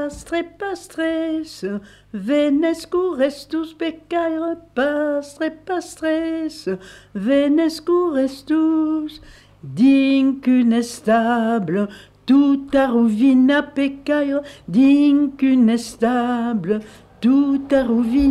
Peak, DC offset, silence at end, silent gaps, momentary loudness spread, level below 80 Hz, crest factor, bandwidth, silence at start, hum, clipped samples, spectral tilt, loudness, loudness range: -6 dBFS; under 0.1%; 0 s; none; 12 LU; -48 dBFS; 12 dB; 12 kHz; 0 s; none; under 0.1%; -6 dB/octave; -19 LUFS; 6 LU